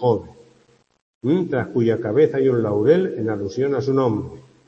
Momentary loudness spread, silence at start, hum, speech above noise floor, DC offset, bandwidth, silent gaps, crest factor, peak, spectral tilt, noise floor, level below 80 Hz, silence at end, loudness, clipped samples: 8 LU; 0 s; none; 39 dB; under 0.1%; 7.2 kHz; 1.02-1.21 s; 16 dB; -4 dBFS; -8.5 dB/octave; -58 dBFS; -58 dBFS; 0.25 s; -20 LUFS; under 0.1%